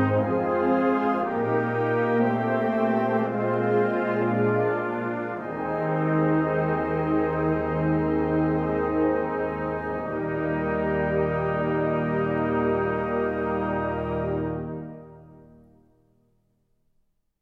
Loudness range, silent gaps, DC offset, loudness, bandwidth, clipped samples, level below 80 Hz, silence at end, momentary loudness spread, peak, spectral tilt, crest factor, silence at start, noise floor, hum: 6 LU; none; under 0.1%; -25 LUFS; 5.6 kHz; under 0.1%; -48 dBFS; 2.05 s; 6 LU; -10 dBFS; -10 dB/octave; 14 dB; 0 s; -69 dBFS; none